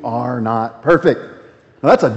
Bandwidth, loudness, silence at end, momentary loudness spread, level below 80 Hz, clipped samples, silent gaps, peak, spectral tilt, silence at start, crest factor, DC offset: 8.2 kHz; -16 LUFS; 0 s; 10 LU; -50 dBFS; under 0.1%; none; 0 dBFS; -7.5 dB/octave; 0 s; 16 dB; under 0.1%